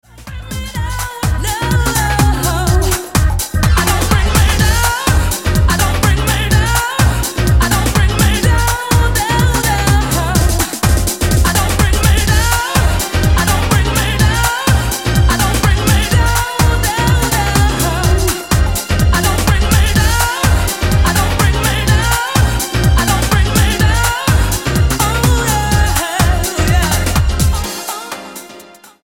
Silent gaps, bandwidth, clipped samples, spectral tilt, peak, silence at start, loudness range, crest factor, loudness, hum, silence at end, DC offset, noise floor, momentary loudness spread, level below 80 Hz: none; 17 kHz; under 0.1%; -4 dB/octave; 0 dBFS; 0.15 s; 1 LU; 12 dB; -13 LUFS; none; 0.4 s; 0.2%; -38 dBFS; 3 LU; -16 dBFS